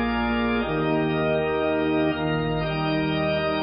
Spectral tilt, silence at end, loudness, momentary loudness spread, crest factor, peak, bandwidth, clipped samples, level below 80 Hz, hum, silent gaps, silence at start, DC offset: -11 dB/octave; 0 s; -24 LUFS; 2 LU; 12 dB; -12 dBFS; 5.4 kHz; under 0.1%; -42 dBFS; none; none; 0 s; under 0.1%